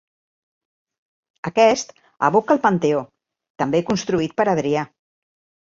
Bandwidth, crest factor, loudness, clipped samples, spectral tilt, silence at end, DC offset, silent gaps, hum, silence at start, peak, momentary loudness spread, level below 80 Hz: 7.6 kHz; 20 dB; -20 LUFS; under 0.1%; -5.5 dB/octave; 0.75 s; under 0.1%; 3.50-3.55 s; none; 1.45 s; -2 dBFS; 9 LU; -58 dBFS